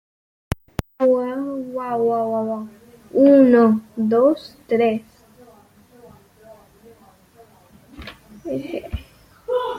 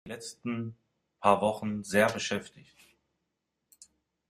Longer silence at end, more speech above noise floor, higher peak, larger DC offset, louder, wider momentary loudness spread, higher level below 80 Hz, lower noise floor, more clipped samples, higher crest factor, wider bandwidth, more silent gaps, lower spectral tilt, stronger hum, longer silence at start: second, 0 s vs 1.7 s; second, 33 dB vs 53 dB; first, -2 dBFS vs -8 dBFS; neither; first, -19 LUFS vs -29 LUFS; first, 23 LU vs 15 LU; first, -46 dBFS vs -68 dBFS; second, -51 dBFS vs -83 dBFS; neither; second, 18 dB vs 24 dB; about the same, 16 kHz vs 15 kHz; neither; first, -7.5 dB/octave vs -4.5 dB/octave; neither; first, 0.5 s vs 0.05 s